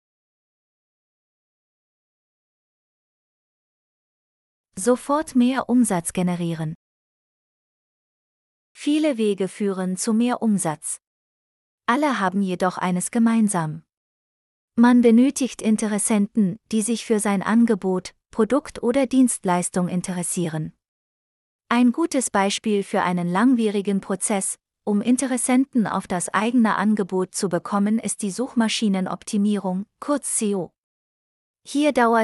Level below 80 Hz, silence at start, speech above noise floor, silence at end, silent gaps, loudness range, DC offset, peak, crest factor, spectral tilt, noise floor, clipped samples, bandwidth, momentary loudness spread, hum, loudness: -62 dBFS; 4.75 s; over 69 dB; 0 s; 6.75-8.75 s, 11.07-11.78 s, 13.97-14.68 s, 20.88-21.59 s, 30.78-31.54 s; 5 LU; under 0.1%; -4 dBFS; 18 dB; -5 dB/octave; under -90 dBFS; under 0.1%; 12 kHz; 9 LU; none; -21 LUFS